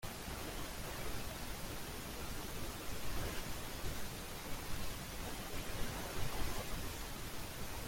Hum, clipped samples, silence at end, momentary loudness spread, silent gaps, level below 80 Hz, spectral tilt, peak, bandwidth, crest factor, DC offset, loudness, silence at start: none; under 0.1%; 0 s; 3 LU; none; -48 dBFS; -3.5 dB/octave; -26 dBFS; 16.5 kHz; 16 dB; under 0.1%; -44 LUFS; 0 s